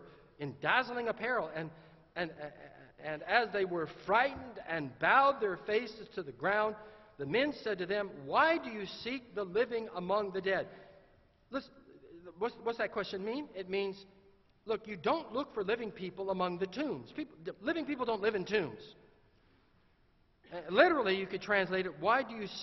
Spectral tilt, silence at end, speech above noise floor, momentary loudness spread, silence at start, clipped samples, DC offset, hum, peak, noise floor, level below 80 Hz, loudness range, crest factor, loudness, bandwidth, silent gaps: -2.5 dB/octave; 0 s; 35 dB; 15 LU; 0 s; under 0.1%; under 0.1%; none; -12 dBFS; -69 dBFS; -68 dBFS; 6 LU; 24 dB; -34 LUFS; 6.2 kHz; none